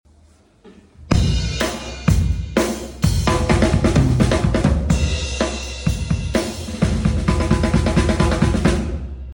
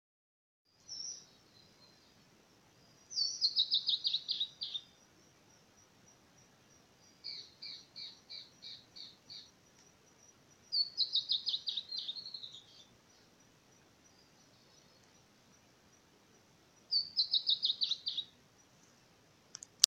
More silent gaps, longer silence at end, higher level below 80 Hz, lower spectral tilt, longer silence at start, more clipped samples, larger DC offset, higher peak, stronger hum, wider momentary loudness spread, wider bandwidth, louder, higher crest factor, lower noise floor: neither; about the same, 0 s vs 0 s; first, -24 dBFS vs -84 dBFS; first, -6 dB/octave vs 1.5 dB/octave; second, 0.65 s vs 0.9 s; neither; neither; about the same, -2 dBFS vs -2 dBFS; neither; second, 7 LU vs 21 LU; about the same, 17 kHz vs 16.5 kHz; first, -19 LUFS vs -35 LUFS; second, 16 dB vs 40 dB; second, -52 dBFS vs -66 dBFS